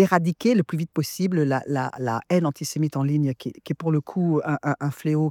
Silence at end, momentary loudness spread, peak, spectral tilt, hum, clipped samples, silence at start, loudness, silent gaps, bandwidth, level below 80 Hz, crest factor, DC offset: 0 s; 6 LU; -4 dBFS; -7 dB/octave; none; under 0.1%; 0 s; -24 LUFS; none; 18 kHz; -70 dBFS; 18 dB; under 0.1%